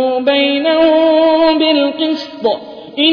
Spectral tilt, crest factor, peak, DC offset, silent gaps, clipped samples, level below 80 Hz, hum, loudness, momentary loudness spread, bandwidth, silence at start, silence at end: -5 dB/octave; 10 dB; -2 dBFS; under 0.1%; none; under 0.1%; -52 dBFS; none; -12 LUFS; 8 LU; 5.4 kHz; 0 s; 0 s